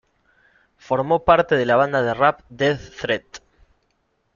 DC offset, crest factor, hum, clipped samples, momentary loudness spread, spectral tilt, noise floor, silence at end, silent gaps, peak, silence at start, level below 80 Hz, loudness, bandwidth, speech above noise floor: under 0.1%; 20 dB; none; under 0.1%; 9 LU; -6 dB/octave; -68 dBFS; 1 s; none; -2 dBFS; 0.9 s; -50 dBFS; -20 LUFS; 7.4 kHz; 49 dB